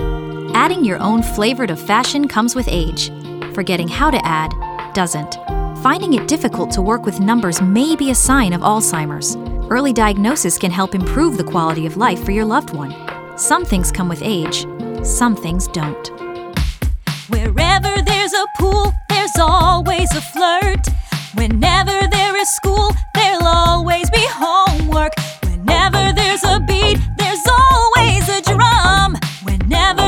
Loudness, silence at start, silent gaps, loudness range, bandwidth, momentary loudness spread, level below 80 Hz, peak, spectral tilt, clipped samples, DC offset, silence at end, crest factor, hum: -15 LUFS; 0 s; none; 5 LU; 19.5 kHz; 10 LU; -22 dBFS; 0 dBFS; -4 dB/octave; under 0.1%; under 0.1%; 0 s; 14 dB; none